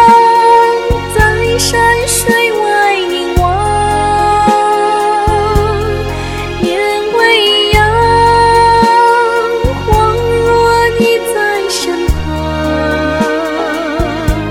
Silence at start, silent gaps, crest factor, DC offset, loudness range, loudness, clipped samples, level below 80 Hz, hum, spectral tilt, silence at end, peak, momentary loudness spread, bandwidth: 0 s; none; 10 dB; under 0.1%; 3 LU; -10 LUFS; 0.2%; -22 dBFS; none; -4 dB/octave; 0 s; 0 dBFS; 8 LU; 18.5 kHz